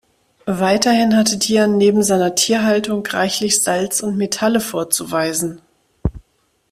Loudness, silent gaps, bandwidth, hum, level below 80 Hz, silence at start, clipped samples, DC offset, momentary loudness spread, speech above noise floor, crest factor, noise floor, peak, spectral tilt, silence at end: -16 LUFS; none; 16 kHz; none; -40 dBFS; 0.45 s; under 0.1%; under 0.1%; 12 LU; 47 dB; 16 dB; -63 dBFS; 0 dBFS; -3.5 dB/octave; 0.5 s